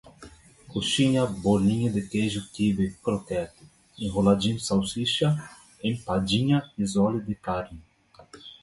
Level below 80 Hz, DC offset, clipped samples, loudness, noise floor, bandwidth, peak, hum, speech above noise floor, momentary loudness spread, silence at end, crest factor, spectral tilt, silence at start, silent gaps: -50 dBFS; under 0.1%; under 0.1%; -26 LUFS; -52 dBFS; 11.5 kHz; -6 dBFS; none; 27 dB; 10 LU; 0.1 s; 20 dB; -5.5 dB/octave; 0.05 s; none